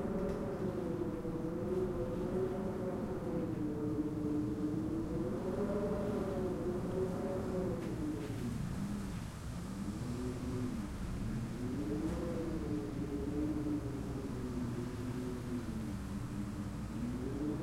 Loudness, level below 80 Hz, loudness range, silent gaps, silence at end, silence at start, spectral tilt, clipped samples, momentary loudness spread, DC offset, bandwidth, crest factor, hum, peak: -39 LUFS; -50 dBFS; 4 LU; none; 0 s; 0 s; -7.5 dB/octave; under 0.1%; 5 LU; under 0.1%; 16.5 kHz; 14 dB; none; -24 dBFS